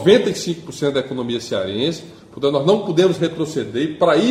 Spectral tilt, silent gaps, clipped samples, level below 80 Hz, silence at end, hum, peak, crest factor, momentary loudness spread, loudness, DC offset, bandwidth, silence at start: -5.5 dB/octave; none; under 0.1%; -56 dBFS; 0 s; none; 0 dBFS; 18 dB; 9 LU; -19 LUFS; under 0.1%; 14.5 kHz; 0 s